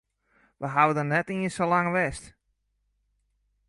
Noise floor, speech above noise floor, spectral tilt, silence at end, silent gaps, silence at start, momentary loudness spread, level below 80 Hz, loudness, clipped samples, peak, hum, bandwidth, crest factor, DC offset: -75 dBFS; 49 dB; -6 dB/octave; 1.4 s; none; 0.6 s; 9 LU; -58 dBFS; -25 LUFS; under 0.1%; -6 dBFS; 50 Hz at -60 dBFS; 11.5 kHz; 22 dB; under 0.1%